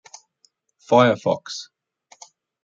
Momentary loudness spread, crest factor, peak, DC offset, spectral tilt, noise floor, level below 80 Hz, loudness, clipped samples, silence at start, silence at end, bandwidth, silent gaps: 18 LU; 20 dB; -2 dBFS; under 0.1%; -5.5 dB/octave; -64 dBFS; -70 dBFS; -19 LUFS; under 0.1%; 0.9 s; 1 s; 7.8 kHz; none